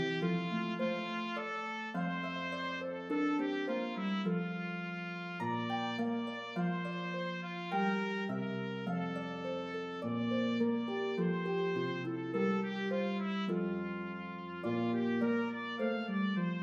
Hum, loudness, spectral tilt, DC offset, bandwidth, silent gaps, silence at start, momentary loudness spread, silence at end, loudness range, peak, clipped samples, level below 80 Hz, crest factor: none; -36 LUFS; -7 dB/octave; under 0.1%; 7.4 kHz; none; 0 s; 6 LU; 0 s; 2 LU; -22 dBFS; under 0.1%; -82 dBFS; 14 dB